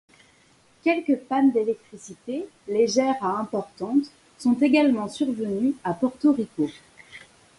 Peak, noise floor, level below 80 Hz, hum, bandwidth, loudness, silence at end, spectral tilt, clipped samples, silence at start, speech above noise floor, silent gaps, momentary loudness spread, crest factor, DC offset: -8 dBFS; -59 dBFS; -68 dBFS; none; 11.5 kHz; -24 LUFS; 0.4 s; -5.5 dB/octave; under 0.1%; 0.85 s; 35 dB; none; 13 LU; 16 dB; under 0.1%